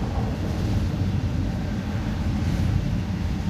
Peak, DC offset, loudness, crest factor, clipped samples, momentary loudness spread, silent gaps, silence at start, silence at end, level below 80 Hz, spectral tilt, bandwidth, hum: -10 dBFS; under 0.1%; -26 LUFS; 14 dB; under 0.1%; 3 LU; none; 0 s; 0 s; -30 dBFS; -7.5 dB/octave; 14 kHz; none